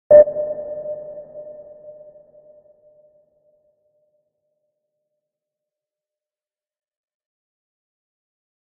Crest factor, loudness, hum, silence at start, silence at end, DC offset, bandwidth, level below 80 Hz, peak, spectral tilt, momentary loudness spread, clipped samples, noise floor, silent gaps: 24 dB; -18 LUFS; none; 0.1 s; 7.1 s; under 0.1%; 2.1 kHz; -60 dBFS; 0 dBFS; -3 dB/octave; 30 LU; under 0.1%; under -90 dBFS; none